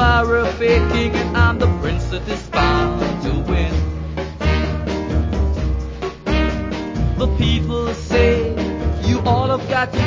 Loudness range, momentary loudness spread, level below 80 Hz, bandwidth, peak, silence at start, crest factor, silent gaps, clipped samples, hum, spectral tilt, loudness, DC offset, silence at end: 3 LU; 8 LU; -22 dBFS; 7.6 kHz; -2 dBFS; 0 s; 16 dB; none; under 0.1%; none; -6.5 dB/octave; -19 LUFS; under 0.1%; 0 s